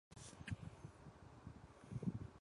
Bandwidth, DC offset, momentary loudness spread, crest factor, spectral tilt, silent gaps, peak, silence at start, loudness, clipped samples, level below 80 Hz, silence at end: 11.5 kHz; under 0.1%; 14 LU; 22 dB; -6 dB/octave; none; -30 dBFS; 0.1 s; -53 LUFS; under 0.1%; -64 dBFS; 0 s